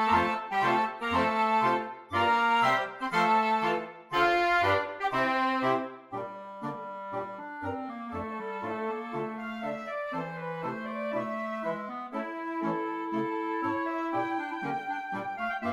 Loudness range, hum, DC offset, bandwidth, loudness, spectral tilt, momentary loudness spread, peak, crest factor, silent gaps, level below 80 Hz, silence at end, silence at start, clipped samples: 9 LU; none; under 0.1%; 16 kHz; -30 LUFS; -5.5 dB/octave; 12 LU; -14 dBFS; 16 dB; none; -64 dBFS; 0 s; 0 s; under 0.1%